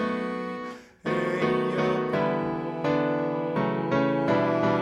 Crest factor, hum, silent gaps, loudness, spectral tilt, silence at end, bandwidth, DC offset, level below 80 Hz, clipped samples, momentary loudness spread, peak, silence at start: 16 dB; none; none; -26 LUFS; -7.5 dB/octave; 0 s; 11 kHz; under 0.1%; -60 dBFS; under 0.1%; 8 LU; -10 dBFS; 0 s